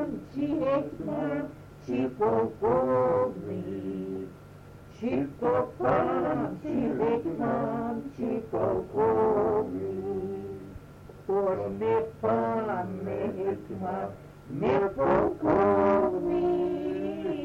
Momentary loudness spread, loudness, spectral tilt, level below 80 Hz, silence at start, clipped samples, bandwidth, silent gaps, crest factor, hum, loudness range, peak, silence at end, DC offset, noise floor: 11 LU; -28 LUFS; -9 dB/octave; -54 dBFS; 0 s; under 0.1%; 10.5 kHz; none; 18 dB; none; 4 LU; -10 dBFS; 0 s; under 0.1%; -48 dBFS